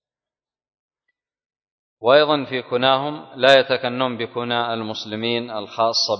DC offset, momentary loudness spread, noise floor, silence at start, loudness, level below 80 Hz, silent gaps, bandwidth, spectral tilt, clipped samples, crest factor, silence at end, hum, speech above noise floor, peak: under 0.1%; 12 LU; under -90 dBFS; 2 s; -19 LUFS; -68 dBFS; none; 8 kHz; -4 dB/octave; under 0.1%; 22 dB; 0 s; none; over 71 dB; 0 dBFS